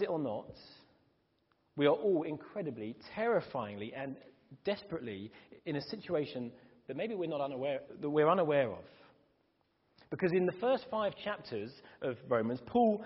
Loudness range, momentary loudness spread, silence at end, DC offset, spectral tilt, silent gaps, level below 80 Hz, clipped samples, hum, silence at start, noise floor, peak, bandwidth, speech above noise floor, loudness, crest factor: 6 LU; 16 LU; 0 s; under 0.1%; -5 dB/octave; none; -74 dBFS; under 0.1%; none; 0 s; -76 dBFS; -16 dBFS; 5.8 kHz; 41 dB; -35 LUFS; 20 dB